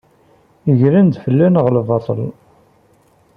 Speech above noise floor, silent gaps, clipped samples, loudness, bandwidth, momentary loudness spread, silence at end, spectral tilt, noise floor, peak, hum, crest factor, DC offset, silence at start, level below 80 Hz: 40 dB; none; under 0.1%; -14 LUFS; 5 kHz; 11 LU; 1.05 s; -11.5 dB/octave; -53 dBFS; -2 dBFS; none; 14 dB; under 0.1%; 0.65 s; -54 dBFS